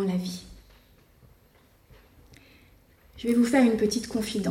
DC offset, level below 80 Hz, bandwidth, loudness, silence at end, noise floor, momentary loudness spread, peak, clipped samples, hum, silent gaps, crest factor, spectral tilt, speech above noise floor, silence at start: under 0.1%; -56 dBFS; 16.5 kHz; -25 LUFS; 0 s; -60 dBFS; 14 LU; -10 dBFS; under 0.1%; none; none; 18 dB; -5.5 dB/octave; 35 dB; 0 s